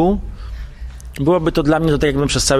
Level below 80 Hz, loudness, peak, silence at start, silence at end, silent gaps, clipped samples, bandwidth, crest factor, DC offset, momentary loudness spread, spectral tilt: -28 dBFS; -17 LUFS; -2 dBFS; 0 s; 0 s; none; under 0.1%; 15.5 kHz; 14 dB; under 0.1%; 17 LU; -5 dB/octave